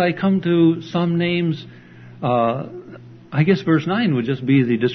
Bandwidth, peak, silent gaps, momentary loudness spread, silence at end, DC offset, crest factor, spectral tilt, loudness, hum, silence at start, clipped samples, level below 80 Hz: 6.2 kHz; -4 dBFS; none; 10 LU; 0 s; under 0.1%; 16 dB; -8.5 dB/octave; -19 LUFS; none; 0 s; under 0.1%; -60 dBFS